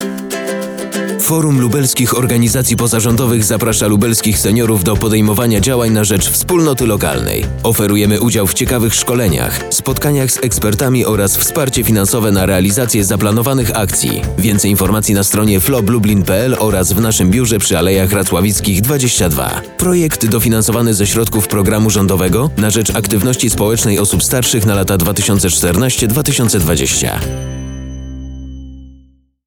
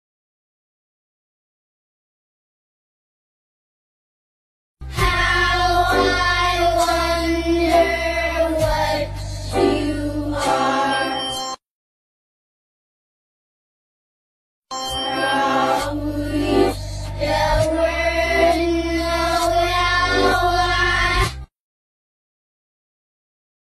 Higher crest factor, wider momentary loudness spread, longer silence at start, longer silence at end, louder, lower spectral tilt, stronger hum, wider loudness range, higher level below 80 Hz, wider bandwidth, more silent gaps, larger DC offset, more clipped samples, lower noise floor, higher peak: second, 10 dB vs 18 dB; second, 5 LU vs 8 LU; second, 0 s vs 4.8 s; second, 0.5 s vs 2.15 s; first, -12 LUFS vs -19 LUFS; about the same, -4.5 dB/octave vs -4.5 dB/octave; neither; second, 1 LU vs 8 LU; about the same, -30 dBFS vs -32 dBFS; first, over 20 kHz vs 13.5 kHz; second, none vs 11.70-14.62 s; first, 0.2% vs under 0.1%; neither; second, -46 dBFS vs under -90 dBFS; about the same, -2 dBFS vs -4 dBFS